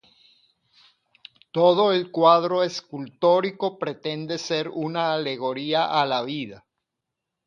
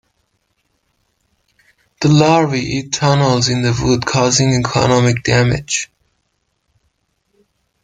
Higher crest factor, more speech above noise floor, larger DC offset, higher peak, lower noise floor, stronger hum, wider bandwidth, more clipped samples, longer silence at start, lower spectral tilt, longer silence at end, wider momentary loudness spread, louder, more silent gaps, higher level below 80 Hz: about the same, 20 dB vs 16 dB; first, 61 dB vs 54 dB; neither; about the same, -4 dBFS vs -2 dBFS; first, -83 dBFS vs -67 dBFS; neither; second, 7.4 kHz vs 9.6 kHz; neither; second, 1.55 s vs 2 s; about the same, -5 dB/octave vs -5 dB/octave; second, 0.9 s vs 2 s; first, 13 LU vs 7 LU; second, -23 LUFS vs -14 LUFS; neither; second, -74 dBFS vs -42 dBFS